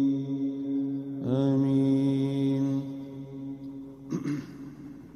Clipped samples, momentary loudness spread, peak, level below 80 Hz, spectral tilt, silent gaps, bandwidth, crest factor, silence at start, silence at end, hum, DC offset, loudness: under 0.1%; 18 LU; -14 dBFS; -66 dBFS; -9 dB/octave; none; 6.8 kHz; 14 dB; 0 s; 0 s; none; under 0.1%; -29 LUFS